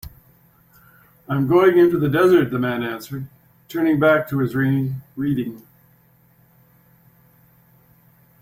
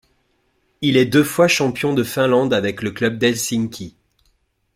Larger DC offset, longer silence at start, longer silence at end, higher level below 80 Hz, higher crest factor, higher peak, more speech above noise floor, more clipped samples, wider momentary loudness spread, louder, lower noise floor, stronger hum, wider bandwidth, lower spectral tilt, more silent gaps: neither; second, 0.05 s vs 0.8 s; first, 2.85 s vs 0.85 s; about the same, -54 dBFS vs -56 dBFS; about the same, 18 dB vs 16 dB; about the same, -4 dBFS vs -2 dBFS; second, 38 dB vs 47 dB; neither; first, 16 LU vs 9 LU; about the same, -19 LUFS vs -18 LUFS; second, -56 dBFS vs -65 dBFS; neither; about the same, 16.5 kHz vs 16.5 kHz; first, -8 dB/octave vs -4.5 dB/octave; neither